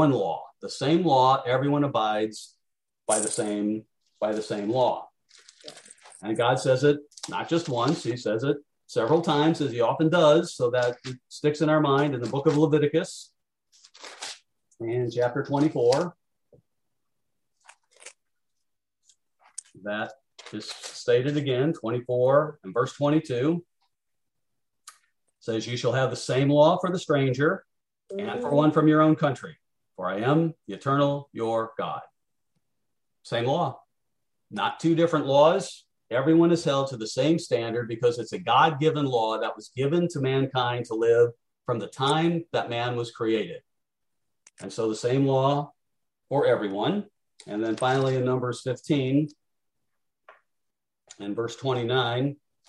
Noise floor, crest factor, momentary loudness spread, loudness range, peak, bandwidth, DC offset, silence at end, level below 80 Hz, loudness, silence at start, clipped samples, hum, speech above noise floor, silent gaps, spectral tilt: -85 dBFS; 20 dB; 16 LU; 7 LU; -6 dBFS; 12 kHz; under 0.1%; 0.35 s; -70 dBFS; -25 LUFS; 0 s; under 0.1%; none; 61 dB; none; -6 dB/octave